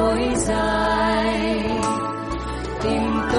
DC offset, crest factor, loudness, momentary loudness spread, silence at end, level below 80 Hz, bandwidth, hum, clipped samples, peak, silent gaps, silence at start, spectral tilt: under 0.1%; 14 dB; -22 LUFS; 8 LU; 0 s; -34 dBFS; 11.5 kHz; none; under 0.1%; -8 dBFS; none; 0 s; -4.5 dB/octave